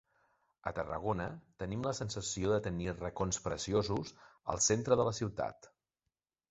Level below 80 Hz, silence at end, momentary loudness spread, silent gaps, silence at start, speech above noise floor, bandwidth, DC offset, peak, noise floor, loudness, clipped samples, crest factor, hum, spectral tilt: -56 dBFS; 0.85 s; 11 LU; none; 0.65 s; 54 dB; 8 kHz; under 0.1%; -14 dBFS; -89 dBFS; -36 LUFS; under 0.1%; 22 dB; none; -5.5 dB/octave